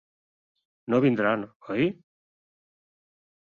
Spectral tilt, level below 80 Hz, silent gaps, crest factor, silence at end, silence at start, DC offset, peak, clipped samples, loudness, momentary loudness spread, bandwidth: -8.5 dB/octave; -66 dBFS; 1.56-1.60 s; 18 dB; 1.65 s; 0.9 s; under 0.1%; -10 dBFS; under 0.1%; -26 LUFS; 9 LU; 6.8 kHz